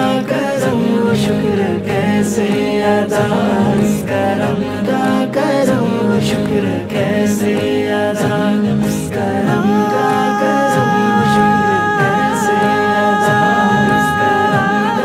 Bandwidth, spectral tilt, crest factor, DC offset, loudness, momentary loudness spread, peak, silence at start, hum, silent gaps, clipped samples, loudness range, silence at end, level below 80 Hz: 15.5 kHz; -6 dB/octave; 12 dB; under 0.1%; -14 LUFS; 4 LU; -2 dBFS; 0 s; none; none; under 0.1%; 3 LU; 0 s; -44 dBFS